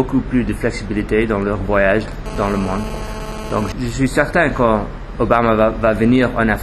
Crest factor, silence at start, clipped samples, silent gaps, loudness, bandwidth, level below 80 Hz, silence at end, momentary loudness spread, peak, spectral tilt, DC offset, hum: 16 dB; 0 s; under 0.1%; none; -17 LUFS; 13 kHz; -28 dBFS; 0 s; 9 LU; 0 dBFS; -6.5 dB/octave; under 0.1%; none